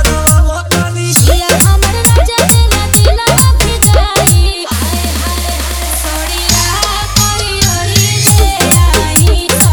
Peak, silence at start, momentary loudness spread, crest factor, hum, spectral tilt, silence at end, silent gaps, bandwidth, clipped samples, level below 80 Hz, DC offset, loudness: 0 dBFS; 0 s; 7 LU; 10 dB; none; -3.5 dB/octave; 0 s; none; over 20 kHz; 0.7%; -14 dBFS; under 0.1%; -9 LUFS